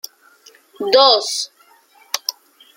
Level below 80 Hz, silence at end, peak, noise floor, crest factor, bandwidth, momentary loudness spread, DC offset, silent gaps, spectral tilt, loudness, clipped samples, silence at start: -74 dBFS; 0.45 s; 0 dBFS; -51 dBFS; 20 dB; 16.5 kHz; 17 LU; under 0.1%; none; 0 dB/octave; -16 LUFS; under 0.1%; 0.8 s